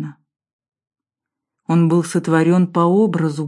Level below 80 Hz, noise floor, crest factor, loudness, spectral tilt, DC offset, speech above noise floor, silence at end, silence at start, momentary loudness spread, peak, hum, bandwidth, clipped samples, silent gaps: -70 dBFS; -85 dBFS; 16 dB; -16 LUFS; -7.5 dB/octave; under 0.1%; 70 dB; 0 s; 0 s; 7 LU; -2 dBFS; none; 11.5 kHz; under 0.1%; 0.53-0.59 s